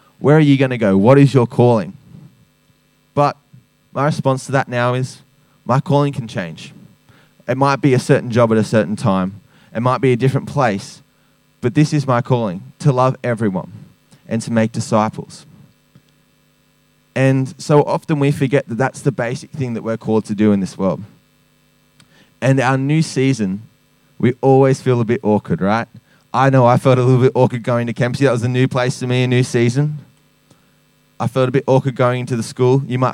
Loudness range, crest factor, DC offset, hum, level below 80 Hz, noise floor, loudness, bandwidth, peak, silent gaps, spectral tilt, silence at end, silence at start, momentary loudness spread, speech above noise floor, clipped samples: 6 LU; 16 dB; under 0.1%; none; -60 dBFS; -57 dBFS; -16 LUFS; 11.5 kHz; 0 dBFS; none; -7 dB/octave; 0 s; 0.2 s; 12 LU; 42 dB; under 0.1%